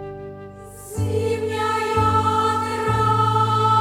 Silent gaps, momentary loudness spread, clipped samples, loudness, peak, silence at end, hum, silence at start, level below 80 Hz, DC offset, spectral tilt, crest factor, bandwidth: none; 18 LU; under 0.1%; -20 LUFS; -6 dBFS; 0 s; 50 Hz at -40 dBFS; 0 s; -44 dBFS; under 0.1%; -6 dB/octave; 14 dB; 15.5 kHz